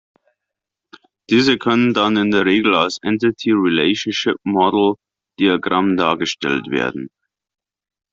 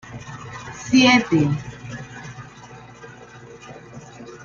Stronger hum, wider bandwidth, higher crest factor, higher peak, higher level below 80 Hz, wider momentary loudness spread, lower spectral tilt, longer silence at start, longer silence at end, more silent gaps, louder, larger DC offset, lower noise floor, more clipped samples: second, none vs 60 Hz at -40 dBFS; about the same, 7.8 kHz vs 7.4 kHz; about the same, 16 dB vs 20 dB; about the same, -2 dBFS vs -2 dBFS; about the same, -58 dBFS vs -54 dBFS; second, 6 LU vs 27 LU; about the same, -5 dB/octave vs -4.5 dB/octave; first, 1.3 s vs 0.05 s; first, 1.05 s vs 0.1 s; neither; about the same, -17 LUFS vs -17 LUFS; neither; first, -83 dBFS vs -42 dBFS; neither